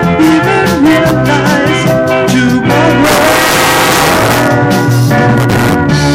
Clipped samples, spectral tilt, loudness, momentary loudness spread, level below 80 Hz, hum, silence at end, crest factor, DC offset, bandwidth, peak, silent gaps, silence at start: under 0.1%; -5 dB/octave; -8 LUFS; 2 LU; -30 dBFS; none; 0 s; 8 dB; under 0.1%; 17 kHz; 0 dBFS; none; 0 s